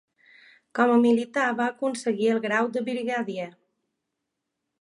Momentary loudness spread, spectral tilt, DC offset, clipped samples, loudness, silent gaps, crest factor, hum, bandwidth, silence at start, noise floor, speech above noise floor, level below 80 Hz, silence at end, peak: 12 LU; -5 dB/octave; under 0.1%; under 0.1%; -25 LUFS; none; 20 dB; none; 11 kHz; 0.75 s; -82 dBFS; 58 dB; -78 dBFS; 1.3 s; -8 dBFS